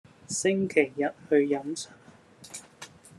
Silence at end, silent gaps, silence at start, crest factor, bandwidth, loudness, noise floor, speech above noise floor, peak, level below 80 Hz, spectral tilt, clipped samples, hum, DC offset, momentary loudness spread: 0.3 s; none; 0.3 s; 22 dB; 12.5 kHz; -27 LUFS; -53 dBFS; 26 dB; -8 dBFS; -74 dBFS; -4.5 dB/octave; under 0.1%; none; under 0.1%; 19 LU